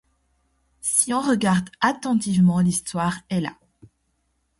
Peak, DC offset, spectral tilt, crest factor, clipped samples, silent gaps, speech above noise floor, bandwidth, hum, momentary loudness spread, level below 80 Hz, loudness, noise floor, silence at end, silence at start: -2 dBFS; under 0.1%; -4.5 dB/octave; 20 dB; under 0.1%; none; 49 dB; 12 kHz; none; 9 LU; -56 dBFS; -21 LUFS; -70 dBFS; 1.05 s; 0.85 s